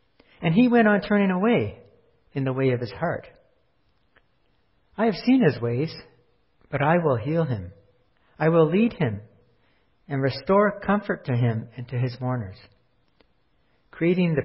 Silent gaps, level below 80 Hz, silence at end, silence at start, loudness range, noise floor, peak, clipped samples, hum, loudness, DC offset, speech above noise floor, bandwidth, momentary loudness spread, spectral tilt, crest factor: none; -56 dBFS; 0 s; 0.4 s; 6 LU; -68 dBFS; -6 dBFS; under 0.1%; none; -23 LUFS; under 0.1%; 46 dB; 5.8 kHz; 13 LU; -11.5 dB/octave; 18 dB